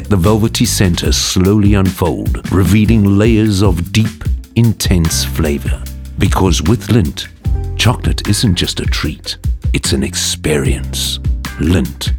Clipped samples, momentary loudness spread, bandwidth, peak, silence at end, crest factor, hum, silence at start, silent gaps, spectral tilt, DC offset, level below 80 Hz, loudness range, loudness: under 0.1%; 9 LU; 18 kHz; 0 dBFS; 0 s; 12 dB; none; 0 s; none; -5 dB/octave; under 0.1%; -22 dBFS; 4 LU; -14 LUFS